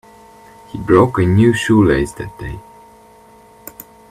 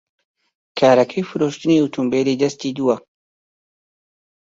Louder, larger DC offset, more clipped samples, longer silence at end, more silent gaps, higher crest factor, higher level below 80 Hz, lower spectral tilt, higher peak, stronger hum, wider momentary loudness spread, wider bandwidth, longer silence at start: first, -13 LUFS vs -18 LUFS; neither; neither; about the same, 1.5 s vs 1.4 s; neither; about the same, 16 dB vs 18 dB; first, -38 dBFS vs -64 dBFS; about the same, -7 dB/octave vs -6 dB/octave; about the same, 0 dBFS vs -2 dBFS; neither; first, 23 LU vs 8 LU; first, 15.5 kHz vs 7.8 kHz; about the same, 0.75 s vs 0.75 s